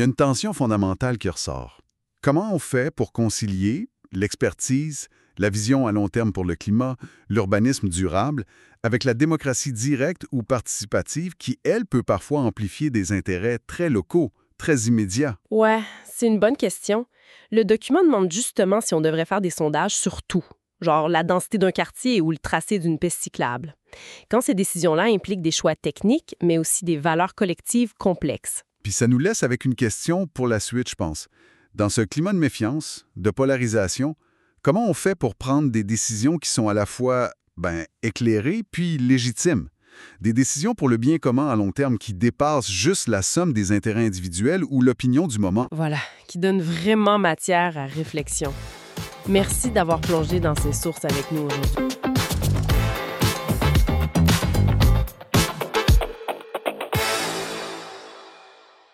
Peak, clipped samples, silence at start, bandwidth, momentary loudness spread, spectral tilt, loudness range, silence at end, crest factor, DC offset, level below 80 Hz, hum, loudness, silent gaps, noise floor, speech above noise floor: -4 dBFS; under 0.1%; 0 s; 16 kHz; 9 LU; -5 dB/octave; 3 LU; 0.65 s; 18 dB; under 0.1%; -36 dBFS; none; -22 LUFS; none; -51 dBFS; 29 dB